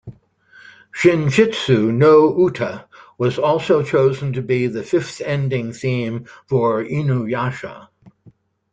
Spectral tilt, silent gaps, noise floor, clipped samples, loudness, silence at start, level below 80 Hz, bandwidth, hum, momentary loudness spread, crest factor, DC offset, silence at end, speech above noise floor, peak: -7 dB/octave; none; -51 dBFS; under 0.1%; -18 LUFS; 0.05 s; -56 dBFS; 9.2 kHz; none; 13 LU; 16 dB; under 0.1%; 0.45 s; 34 dB; -2 dBFS